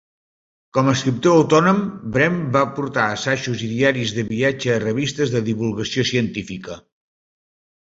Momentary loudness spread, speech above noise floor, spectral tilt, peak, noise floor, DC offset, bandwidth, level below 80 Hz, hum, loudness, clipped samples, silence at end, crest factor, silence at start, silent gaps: 9 LU; over 71 dB; -5.5 dB/octave; -2 dBFS; under -90 dBFS; under 0.1%; 7.8 kHz; -54 dBFS; none; -19 LUFS; under 0.1%; 1.1 s; 18 dB; 0.75 s; none